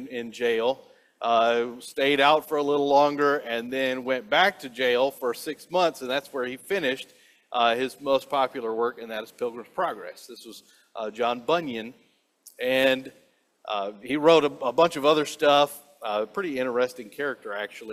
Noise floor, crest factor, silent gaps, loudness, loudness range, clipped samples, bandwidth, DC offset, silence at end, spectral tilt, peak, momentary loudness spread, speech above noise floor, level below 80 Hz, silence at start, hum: -56 dBFS; 20 dB; none; -25 LUFS; 7 LU; under 0.1%; 16 kHz; under 0.1%; 0 s; -4 dB/octave; -4 dBFS; 15 LU; 31 dB; -72 dBFS; 0 s; none